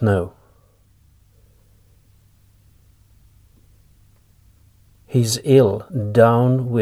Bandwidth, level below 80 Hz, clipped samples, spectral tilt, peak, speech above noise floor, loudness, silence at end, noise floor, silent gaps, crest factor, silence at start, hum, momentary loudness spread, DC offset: 15.5 kHz; -54 dBFS; under 0.1%; -6.5 dB/octave; 0 dBFS; 39 dB; -17 LUFS; 0 s; -55 dBFS; none; 20 dB; 0 s; none; 9 LU; under 0.1%